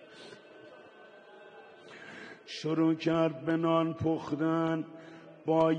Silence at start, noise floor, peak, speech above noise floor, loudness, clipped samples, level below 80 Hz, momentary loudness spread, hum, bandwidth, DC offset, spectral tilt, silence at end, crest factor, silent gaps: 0.1 s; -54 dBFS; -14 dBFS; 25 dB; -31 LUFS; under 0.1%; -70 dBFS; 24 LU; none; 8 kHz; under 0.1%; -7.5 dB/octave; 0 s; 20 dB; none